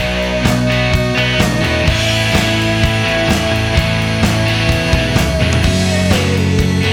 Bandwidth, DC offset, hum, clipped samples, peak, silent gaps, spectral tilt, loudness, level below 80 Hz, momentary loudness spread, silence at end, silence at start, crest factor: 19.5 kHz; under 0.1%; none; under 0.1%; 0 dBFS; none; -5 dB/octave; -13 LUFS; -24 dBFS; 1 LU; 0 s; 0 s; 12 dB